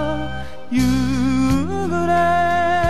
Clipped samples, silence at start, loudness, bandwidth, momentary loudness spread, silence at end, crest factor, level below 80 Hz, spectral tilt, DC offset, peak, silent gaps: under 0.1%; 0 s; -19 LUFS; 14 kHz; 9 LU; 0 s; 12 dB; -34 dBFS; -6.5 dB/octave; 4%; -6 dBFS; none